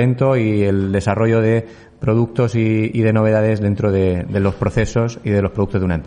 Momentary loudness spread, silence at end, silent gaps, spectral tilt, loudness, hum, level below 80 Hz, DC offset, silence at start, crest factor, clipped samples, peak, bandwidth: 4 LU; 0 s; none; -8 dB/octave; -17 LUFS; none; -40 dBFS; under 0.1%; 0 s; 12 dB; under 0.1%; -4 dBFS; 10 kHz